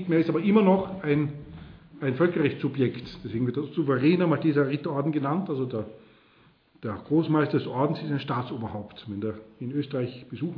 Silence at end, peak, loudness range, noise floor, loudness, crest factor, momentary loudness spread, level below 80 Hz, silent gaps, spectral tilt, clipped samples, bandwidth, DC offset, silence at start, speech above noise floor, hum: 0 s; -8 dBFS; 3 LU; -60 dBFS; -26 LUFS; 18 dB; 14 LU; -60 dBFS; none; -10.5 dB/octave; under 0.1%; 5.4 kHz; under 0.1%; 0 s; 34 dB; none